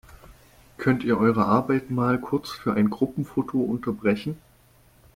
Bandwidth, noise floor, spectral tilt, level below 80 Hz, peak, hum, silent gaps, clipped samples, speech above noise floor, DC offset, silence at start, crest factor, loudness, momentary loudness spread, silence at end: 16 kHz; -57 dBFS; -8 dB/octave; -54 dBFS; -8 dBFS; none; none; under 0.1%; 33 dB; under 0.1%; 0.3 s; 18 dB; -24 LUFS; 7 LU; 0.8 s